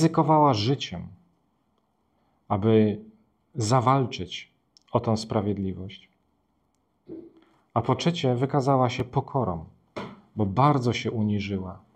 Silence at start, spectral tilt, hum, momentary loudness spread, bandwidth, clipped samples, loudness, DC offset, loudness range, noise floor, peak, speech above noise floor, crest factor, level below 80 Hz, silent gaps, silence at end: 0 s; -6.5 dB/octave; none; 18 LU; 10 kHz; under 0.1%; -25 LUFS; under 0.1%; 6 LU; -71 dBFS; -6 dBFS; 47 dB; 20 dB; -58 dBFS; none; 0.2 s